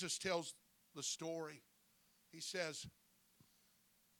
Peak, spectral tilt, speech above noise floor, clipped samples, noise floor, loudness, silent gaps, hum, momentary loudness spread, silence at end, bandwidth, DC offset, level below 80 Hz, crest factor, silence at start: -26 dBFS; -2 dB/octave; 30 dB; under 0.1%; -75 dBFS; -45 LUFS; none; none; 20 LU; 1.3 s; 19 kHz; under 0.1%; -82 dBFS; 22 dB; 0 s